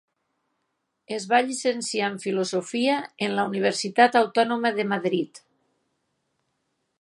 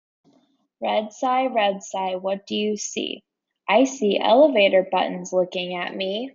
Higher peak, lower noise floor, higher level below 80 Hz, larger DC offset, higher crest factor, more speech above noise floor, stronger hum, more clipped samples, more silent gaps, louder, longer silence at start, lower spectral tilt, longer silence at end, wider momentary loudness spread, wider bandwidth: first, -2 dBFS vs -6 dBFS; first, -77 dBFS vs -63 dBFS; about the same, -78 dBFS vs -74 dBFS; neither; first, 22 dB vs 16 dB; first, 54 dB vs 42 dB; neither; neither; neither; about the same, -24 LUFS vs -22 LUFS; first, 1.1 s vs 0.8 s; about the same, -4 dB/octave vs -4 dB/octave; first, 1.6 s vs 0.05 s; second, 8 LU vs 12 LU; first, 11.5 kHz vs 7.6 kHz